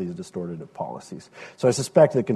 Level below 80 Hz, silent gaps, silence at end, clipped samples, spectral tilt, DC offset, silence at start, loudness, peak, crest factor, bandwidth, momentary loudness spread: -62 dBFS; none; 0 s; under 0.1%; -6 dB/octave; under 0.1%; 0 s; -23 LUFS; -4 dBFS; 20 dB; 12.5 kHz; 22 LU